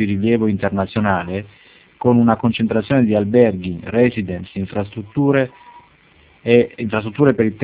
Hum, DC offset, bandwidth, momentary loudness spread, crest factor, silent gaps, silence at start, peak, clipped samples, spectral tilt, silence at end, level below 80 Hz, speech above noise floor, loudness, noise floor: none; under 0.1%; 4 kHz; 11 LU; 18 dB; none; 0 s; 0 dBFS; under 0.1%; -11.5 dB/octave; 0 s; -44 dBFS; 34 dB; -18 LUFS; -51 dBFS